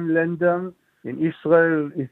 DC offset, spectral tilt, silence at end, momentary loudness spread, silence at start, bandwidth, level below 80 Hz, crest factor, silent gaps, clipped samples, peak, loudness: under 0.1%; -10 dB/octave; 0.05 s; 17 LU; 0 s; 4 kHz; -68 dBFS; 16 dB; none; under 0.1%; -4 dBFS; -21 LUFS